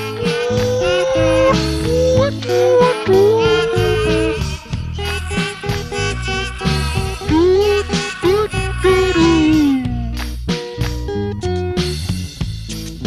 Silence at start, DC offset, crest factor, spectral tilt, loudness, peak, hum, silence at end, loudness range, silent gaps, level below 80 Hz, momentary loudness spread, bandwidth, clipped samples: 0 s; under 0.1%; 14 dB; -5.5 dB/octave; -16 LUFS; -2 dBFS; none; 0 s; 6 LU; none; -28 dBFS; 10 LU; 15 kHz; under 0.1%